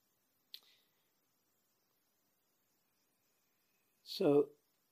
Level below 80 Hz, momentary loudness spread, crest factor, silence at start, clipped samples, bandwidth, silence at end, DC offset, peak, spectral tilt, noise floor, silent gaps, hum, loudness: under -90 dBFS; 24 LU; 22 dB; 4.1 s; under 0.1%; 15.5 kHz; 0.45 s; under 0.1%; -20 dBFS; -6.5 dB/octave; -81 dBFS; none; none; -34 LUFS